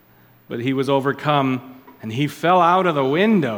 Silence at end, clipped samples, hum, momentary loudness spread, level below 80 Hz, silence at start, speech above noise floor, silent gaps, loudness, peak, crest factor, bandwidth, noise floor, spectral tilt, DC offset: 0 s; under 0.1%; none; 13 LU; -66 dBFS; 0.5 s; 33 dB; none; -19 LUFS; -2 dBFS; 16 dB; 18 kHz; -51 dBFS; -7 dB/octave; under 0.1%